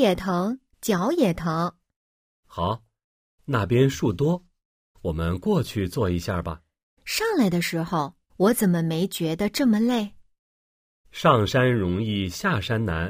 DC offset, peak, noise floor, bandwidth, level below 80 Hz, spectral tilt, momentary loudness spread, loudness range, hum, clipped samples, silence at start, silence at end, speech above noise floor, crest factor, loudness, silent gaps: under 0.1%; -4 dBFS; under -90 dBFS; 15.5 kHz; -46 dBFS; -6 dB/octave; 11 LU; 4 LU; none; under 0.1%; 0 s; 0 s; over 67 dB; 20 dB; -24 LUFS; 1.96-2.43 s, 3.04-3.38 s, 4.65-4.94 s, 6.83-6.97 s, 10.39-11.04 s